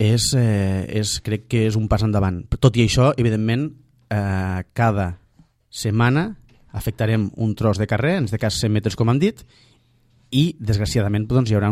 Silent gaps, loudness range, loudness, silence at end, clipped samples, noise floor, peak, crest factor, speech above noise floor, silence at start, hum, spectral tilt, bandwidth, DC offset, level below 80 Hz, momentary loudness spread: none; 3 LU; -20 LUFS; 0 s; under 0.1%; -58 dBFS; -2 dBFS; 18 dB; 39 dB; 0 s; none; -6 dB/octave; 14.5 kHz; under 0.1%; -38 dBFS; 8 LU